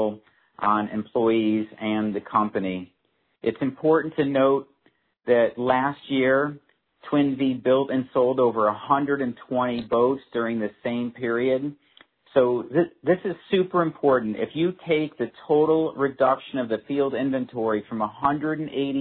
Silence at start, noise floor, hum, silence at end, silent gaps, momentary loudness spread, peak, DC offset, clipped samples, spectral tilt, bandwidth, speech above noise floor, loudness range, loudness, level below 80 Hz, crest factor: 0 s; -66 dBFS; none; 0 s; none; 7 LU; -6 dBFS; under 0.1%; under 0.1%; -10.5 dB/octave; 4.4 kHz; 43 dB; 2 LU; -24 LUFS; -64 dBFS; 18 dB